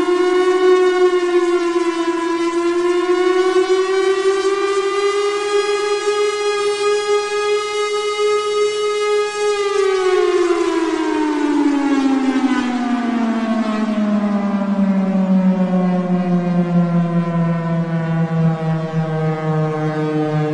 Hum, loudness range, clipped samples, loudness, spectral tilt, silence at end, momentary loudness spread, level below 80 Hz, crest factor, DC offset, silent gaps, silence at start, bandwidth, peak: none; 2 LU; under 0.1%; -17 LUFS; -6 dB/octave; 0 s; 4 LU; -56 dBFS; 12 dB; under 0.1%; none; 0 s; 11.5 kHz; -4 dBFS